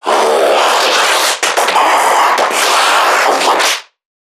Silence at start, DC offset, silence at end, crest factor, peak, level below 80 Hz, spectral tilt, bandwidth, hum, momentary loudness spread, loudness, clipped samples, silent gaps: 0.05 s; under 0.1%; 0.4 s; 12 dB; 0 dBFS; -70 dBFS; 1 dB/octave; 19.5 kHz; none; 2 LU; -10 LUFS; under 0.1%; none